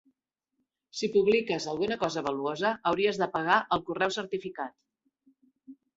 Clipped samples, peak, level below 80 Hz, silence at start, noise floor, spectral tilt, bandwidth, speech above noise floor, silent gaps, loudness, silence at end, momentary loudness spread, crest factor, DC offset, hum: under 0.1%; -10 dBFS; -68 dBFS; 0.95 s; -82 dBFS; -4.5 dB/octave; 8 kHz; 54 dB; none; -28 LUFS; 0.25 s; 10 LU; 22 dB; under 0.1%; none